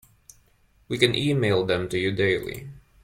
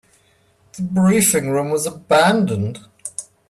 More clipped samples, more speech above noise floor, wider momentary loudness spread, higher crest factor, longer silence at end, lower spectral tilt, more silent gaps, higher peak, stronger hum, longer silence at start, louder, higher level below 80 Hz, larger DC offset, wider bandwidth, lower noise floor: neither; about the same, 38 dB vs 41 dB; about the same, 14 LU vs 16 LU; first, 22 dB vs 16 dB; about the same, 0.25 s vs 0.3 s; about the same, -5.5 dB/octave vs -4.5 dB/octave; neither; about the same, -4 dBFS vs -4 dBFS; neither; first, 0.9 s vs 0.75 s; second, -23 LUFS vs -17 LUFS; about the same, -54 dBFS vs -56 dBFS; neither; about the same, 16 kHz vs 15.5 kHz; first, -61 dBFS vs -57 dBFS